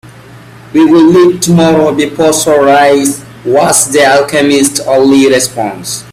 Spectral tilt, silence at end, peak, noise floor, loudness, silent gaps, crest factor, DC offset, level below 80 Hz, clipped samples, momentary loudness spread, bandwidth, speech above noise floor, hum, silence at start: -4 dB/octave; 0.1 s; 0 dBFS; -32 dBFS; -7 LUFS; none; 8 dB; under 0.1%; -46 dBFS; 0.2%; 9 LU; over 20 kHz; 25 dB; none; 0.35 s